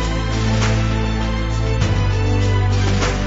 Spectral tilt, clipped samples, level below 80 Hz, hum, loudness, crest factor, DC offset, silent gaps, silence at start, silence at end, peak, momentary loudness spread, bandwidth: -6 dB/octave; under 0.1%; -22 dBFS; none; -19 LUFS; 12 dB; under 0.1%; none; 0 s; 0 s; -4 dBFS; 3 LU; 7.8 kHz